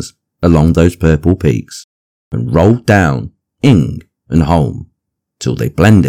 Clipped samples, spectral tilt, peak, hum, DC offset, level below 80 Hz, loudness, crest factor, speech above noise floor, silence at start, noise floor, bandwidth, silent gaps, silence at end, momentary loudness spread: 1%; -7.5 dB/octave; 0 dBFS; none; under 0.1%; -28 dBFS; -12 LUFS; 12 dB; 61 dB; 0 s; -71 dBFS; 15 kHz; 1.84-2.31 s; 0 s; 19 LU